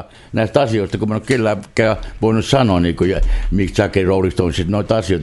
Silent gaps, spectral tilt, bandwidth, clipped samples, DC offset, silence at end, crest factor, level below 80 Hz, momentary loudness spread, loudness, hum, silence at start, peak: none; -6.5 dB/octave; 11.5 kHz; under 0.1%; under 0.1%; 0 s; 16 dB; -26 dBFS; 5 LU; -17 LUFS; none; 0 s; 0 dBFS